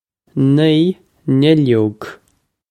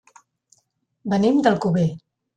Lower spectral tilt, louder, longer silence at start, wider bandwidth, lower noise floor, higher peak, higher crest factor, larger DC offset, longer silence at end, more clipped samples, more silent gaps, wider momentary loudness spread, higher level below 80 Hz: about the same, -8.5 dB/octave vs -7.5 dB/octave; first, -14 LUFS vs -20 LUFS; second, 0.35 s vs 1.05 s; about the same, 9.8 kHz vs 9.2 kHz; second, -62 dBFS vs -69 dBFS; first, 0 dBFS vs -4 dBFS; about the same, 16 dB vs 18 dB; neither; first, 0.55 s vs 0.4 s; neither; neither; about the same, 15 LU vs 16 LU; about the same, -56 dBFS vs -58 dBFS